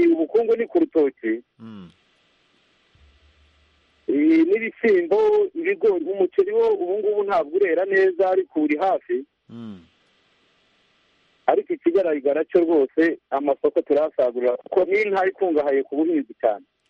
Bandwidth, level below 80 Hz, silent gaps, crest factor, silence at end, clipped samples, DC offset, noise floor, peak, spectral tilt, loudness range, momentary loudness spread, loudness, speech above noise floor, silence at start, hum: 6 kHz; -66 dBFS; none; 16 dB; 0.3 s; under 0.1%; under 0.1%; -63 dBFS; -4 dBFS; -7.5 dB/octave; 7 LU; 9 LU; -21 LUFS; 42 dB; 0 s; none